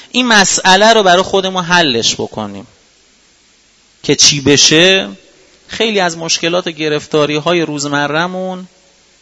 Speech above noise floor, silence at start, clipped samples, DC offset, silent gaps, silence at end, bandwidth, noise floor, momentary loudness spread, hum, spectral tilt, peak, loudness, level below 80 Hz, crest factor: 38 dB; 0.15 s; 0.3%; under 0.1%; none; 0.55 s; 11 kHz; -50 dBFS; 15 LU; none; -2.5 dB/octave; 0 dBFS; -10 LUFS; -48 dBFS; 14 dB